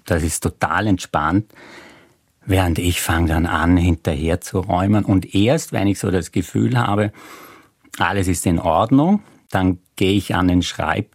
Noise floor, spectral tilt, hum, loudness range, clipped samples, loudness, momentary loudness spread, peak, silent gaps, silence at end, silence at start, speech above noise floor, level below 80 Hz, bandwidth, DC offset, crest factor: -53 dBFS; -5.5 dB/octave; none; 2 LU; under 0.1%; -19 LUFS; 6 LU; -2 dBFS; none; 0.1 s; 0.05 s; 35 dB; -40 dBFS; 16 kHz; under 0.1%; 16 dB